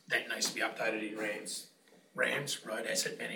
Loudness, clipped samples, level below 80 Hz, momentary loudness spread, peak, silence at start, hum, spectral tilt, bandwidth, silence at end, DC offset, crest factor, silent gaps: -35 LUFS; under 0.1%; under -90 dBFS; 9 LU; -18 dBFS; 0.1 s; none; -1.5 dB/octave; 19 kHz; 0 s; under 0.1%; 18 dB; none